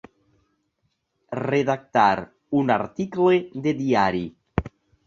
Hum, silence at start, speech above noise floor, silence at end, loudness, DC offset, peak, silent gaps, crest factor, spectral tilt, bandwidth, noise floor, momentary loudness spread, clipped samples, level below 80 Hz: none; 1.3 s; 52 dB; 0.4 s; -23 LUFS; under 0.1%; -4 dBFS; none; 20 dB; -7 dB/octave; 7.4 kHz; -73 dBFS; 10 LU; under 0.1%; -48 dBFS